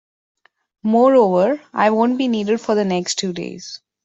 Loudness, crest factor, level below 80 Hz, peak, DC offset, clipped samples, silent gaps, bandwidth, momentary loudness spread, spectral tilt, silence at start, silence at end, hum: -17 LUFS; 16 dB; -64 dBFS; -2 dBFS; under 0.1%; under 0.1%; none; 8.2 kHz; 15 LU; -5 dB/octave; 0.85 s; 0.3 s; none